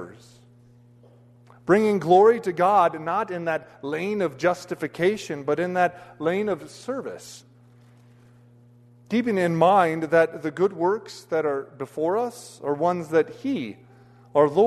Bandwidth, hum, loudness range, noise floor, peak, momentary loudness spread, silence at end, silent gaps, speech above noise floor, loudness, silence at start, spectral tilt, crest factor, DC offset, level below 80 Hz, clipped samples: 13.5 kHz; none; 7 LU; -53 dBFS; -6 dBFS; 13 LU; 0 s; none; 30 dB; -23 LUFS; 0 s; -6.5 dB/octave; 18 dB; under 0.1%; -68 dBFS; under 0.1%